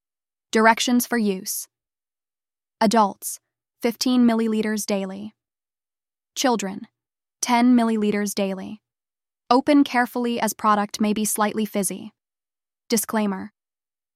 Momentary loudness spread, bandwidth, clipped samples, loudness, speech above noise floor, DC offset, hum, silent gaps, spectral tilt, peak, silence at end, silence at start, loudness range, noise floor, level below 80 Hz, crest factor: 15 LU; 16 kHz; under 0.1%; -21 LUFS; over 69 dB; under 0.1%; none; none; -4 dB/octave; -2 dBFS; 0.65 s; 0.55 s; 3 LU; under -90 dBFS; -68 dBFS; 20 dB